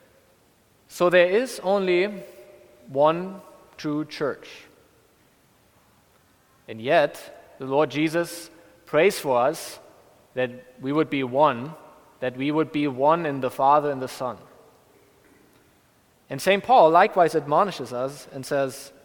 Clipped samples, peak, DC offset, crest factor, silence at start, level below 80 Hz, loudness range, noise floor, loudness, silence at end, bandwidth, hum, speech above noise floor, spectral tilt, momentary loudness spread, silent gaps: under 0.1%; -2 dBFS; under 0.1%; 22 dB; 0.9 s; -68 dBFS; 7 LU; -60 dBFS; -23 LUFS; 0.15 s; 19 kHz; none; 38 dB; -5 dB/octave; 19 LU; none